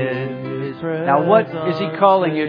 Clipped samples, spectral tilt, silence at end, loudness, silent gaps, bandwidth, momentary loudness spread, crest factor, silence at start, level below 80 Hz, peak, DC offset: under 0.1%; -9 dB/octave; 0 s; -18 LUFS; none; 5.2 kHz; 11 LU; 18 dB; 0 s; -64 dBFS; 0 dBFS; under 0.1%